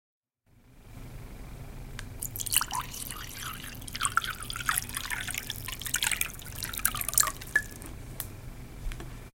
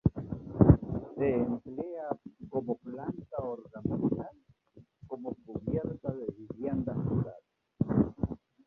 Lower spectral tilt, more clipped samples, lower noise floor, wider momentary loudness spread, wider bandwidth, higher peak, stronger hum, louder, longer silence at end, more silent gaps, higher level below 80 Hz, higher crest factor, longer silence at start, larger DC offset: second, -1 dB/octave vs -13 dB/octave; neither; about the same, -63 dBFS vs -60 dBFS; first, 19 LU vs 14 LU; first, 17 kHz vs 3.2 kHz; first, 0 dBFS vs -6 dBFS; neither; about the same, -31 LUFS vs -33 LUFS; second, 0.05 s vs 0.3 s; neither; about the same, -46 dBFS vs -46 dBFS; first, 34 dB vs 26 dB; first, 0.55 s vs 0.05 s; neither